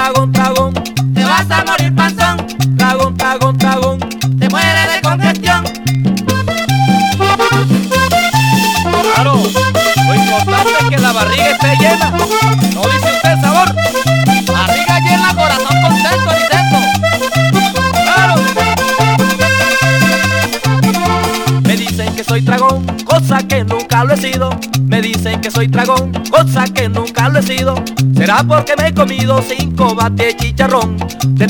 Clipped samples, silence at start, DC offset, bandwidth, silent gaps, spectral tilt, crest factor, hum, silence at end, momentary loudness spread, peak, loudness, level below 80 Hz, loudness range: under 0.1%; 0 s; under 0.1%; 19 kHz; none; -5 dB/octave; 10 dB; none; 0 s; 5 LU; 0 dBFS; -11 LUFS; -34 dBFS; 2 LU